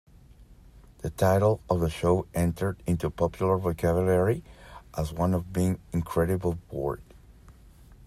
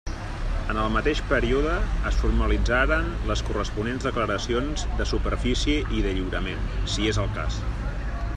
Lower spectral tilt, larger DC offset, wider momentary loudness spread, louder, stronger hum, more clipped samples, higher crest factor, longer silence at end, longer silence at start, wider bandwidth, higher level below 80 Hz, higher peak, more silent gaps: first, -7.5 dB/octave vs -5.5 dB/octave; neither; first, 10 LU vs 7 LU; about the same, -27 LUFS vs -26 LUFS; neither; neither; about the same, 18 dB vs 18 dB; about the same, 0 s vs 0 s; first, 0.4 s vs 0.05 s; first, 15 kHz vs 9.8 kHz; second, -46 dBFS vs -28 dBFS; second, -10 dBFS vs -6 dBFS; neither